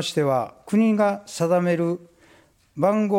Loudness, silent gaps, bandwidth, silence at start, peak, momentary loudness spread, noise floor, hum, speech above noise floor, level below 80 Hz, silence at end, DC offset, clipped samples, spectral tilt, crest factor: -22 LUFS; none; 15.5 kHz; 0 s; -6 dBFS; 7 LU; -56 dBFS; none; 35 dB; -66 dBFS; 0 s; under 0.1%; under 0.1%; -6 dB/octave; 16 dB